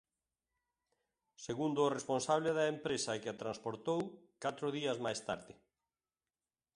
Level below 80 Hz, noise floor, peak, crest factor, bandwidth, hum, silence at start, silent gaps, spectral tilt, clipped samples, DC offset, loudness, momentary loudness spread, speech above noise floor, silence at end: -76 dBFS; under -90 dBFS; -18 dBFS; 20 dB; 11.5 kHz; none; 1.4 s; none; -4.5 dB/octave; under 0.1%; under 0.1%; -38 LUFS; 10 LU; over 53 dB; 1.25 s